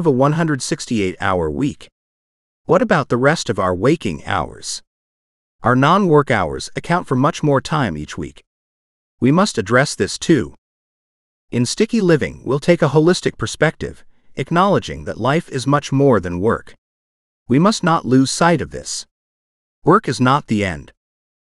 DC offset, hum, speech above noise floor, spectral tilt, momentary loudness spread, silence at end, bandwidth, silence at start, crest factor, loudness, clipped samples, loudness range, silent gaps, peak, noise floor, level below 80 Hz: under 0.1%; none; over 74 dB; -5.5 dB/octave; 12 LU; 0.65 s; 12 kHz; 0 s; 18 dB; -17 LUFS; under 0.1%; 2 LU; 1.92-2.65 s, 4.87-5.59 s, 8.47-9.18 s, 10.58-11.48 s, 16.78-17.46 s, 19.11-19.82 s; 0 dBFS; under -90 dBFS; -44 dBFS